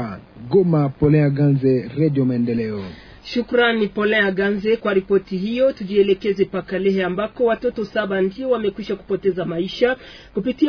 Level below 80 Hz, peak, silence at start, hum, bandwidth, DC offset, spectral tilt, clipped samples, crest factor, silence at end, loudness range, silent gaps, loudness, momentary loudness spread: -48 dBFS; -4 dBFS; 0 s; none; 5.4 kHz; under 0.1%; -8.5 dB/octave; under 0.1%; 14 dB; 0 s; 3 LU; none; -20 LUFS; 9 LU